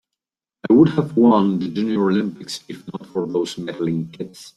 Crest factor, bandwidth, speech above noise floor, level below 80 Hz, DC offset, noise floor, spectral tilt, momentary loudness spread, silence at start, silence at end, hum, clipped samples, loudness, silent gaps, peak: 18 dB; 12.5 kHz; 66 dB; -58 dBFS; under 0.1%; -85 dBFS; -7 dB/octave; 17 LU; 0.65 s; 0.1 s; none; under 0.1%; -19 LUFS; none; -2 dBFS